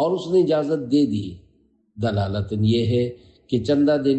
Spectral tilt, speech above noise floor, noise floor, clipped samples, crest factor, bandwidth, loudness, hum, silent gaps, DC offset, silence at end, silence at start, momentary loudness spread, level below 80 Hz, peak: -8 dB/octave; 40 dB; -61 dBFS; under 0.1%; 12 dB; 8.6 kHz; -21 LUFS; none; none; under 0.1%; 0 s; 0 s; 9 LU; -52 dBFS; -8 dBFS